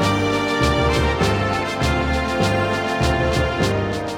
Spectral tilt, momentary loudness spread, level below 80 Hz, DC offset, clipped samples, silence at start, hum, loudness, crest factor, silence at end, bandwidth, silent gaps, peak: -5.5 dB/octave; 3 LU; -28 dBFS; under 0.1%; under 0.1%; 0 s; none; -19 LUFS; 14 dB; 0 s; 17 kHz; none; -6 dBFS